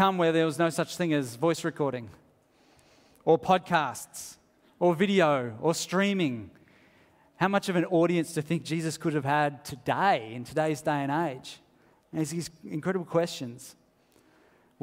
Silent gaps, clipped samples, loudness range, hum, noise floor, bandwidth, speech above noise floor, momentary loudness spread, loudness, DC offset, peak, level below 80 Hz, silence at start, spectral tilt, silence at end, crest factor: none; under 0.1%; 4 LU; none; -63 dBFS; 16 kHz; 36 dB; 14 LU; -28 LUFS; under 0.1%; -8 dBFS; -68 dBFS; 0 s; -5.5 dB/octave; 1.1 s; 22 dB